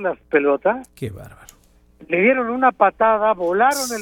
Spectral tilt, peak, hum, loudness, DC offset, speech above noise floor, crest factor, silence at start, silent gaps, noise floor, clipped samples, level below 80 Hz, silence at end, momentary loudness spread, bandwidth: -4.5 dB/octave; -2 dBFS; none; -18 LUFS; under 0.1%; 35 dB; 16 dB; 0 s; none; -53 dBFS; under 0.1%; -54 dBFS; 0 s; 16 LU; 17.5 kHz